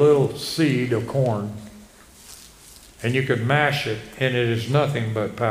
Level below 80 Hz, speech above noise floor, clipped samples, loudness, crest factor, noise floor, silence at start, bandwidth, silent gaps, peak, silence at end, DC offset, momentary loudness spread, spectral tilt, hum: -54 dBFS; 26 dB; under 0.1%; -22 LUFS; 18 dB; -47 dBFS; 0 s; 15.5 kHz; none; -4 dBFS; 0 s; under 0.1%; 21 LU; -6 dB/octave; none